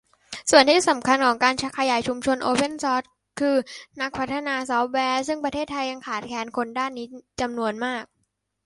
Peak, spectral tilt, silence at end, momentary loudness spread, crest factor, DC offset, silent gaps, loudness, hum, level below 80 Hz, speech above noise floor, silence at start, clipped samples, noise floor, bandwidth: -2 dBFS; -2.5 dB/octave; 0.6 s; 12 LU; 22 dB; under 0.1%; none; -23 LUFS; none; -58 dBFS; 51 dB; 0.3 s; under 0.1%; -74 dBFS; 11.5 kHz